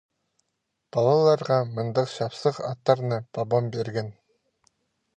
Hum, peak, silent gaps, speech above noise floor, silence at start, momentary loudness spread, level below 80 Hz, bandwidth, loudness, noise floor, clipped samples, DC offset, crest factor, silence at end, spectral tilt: none; -6 dBFS; none; 55 dB; 0.95 s; 10 LU; -68 dBFS; 9.2 kHz; -25 LUFS; -79 dBFS; under 0.1%; under 0.1%; 20 dB; 1.05 s; -7 dB/octave